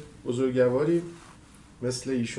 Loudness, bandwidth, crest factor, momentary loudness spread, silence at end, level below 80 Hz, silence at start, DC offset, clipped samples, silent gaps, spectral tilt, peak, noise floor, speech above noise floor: -27 LUFS; 11.5 kHz; 16 dB; 14 LU; 0 s; -58 dBFS; 0 s; under 0.1%; under 0.1%; none; -6 dB/octave; -12 dBFS; -51 dBFS; 25 dB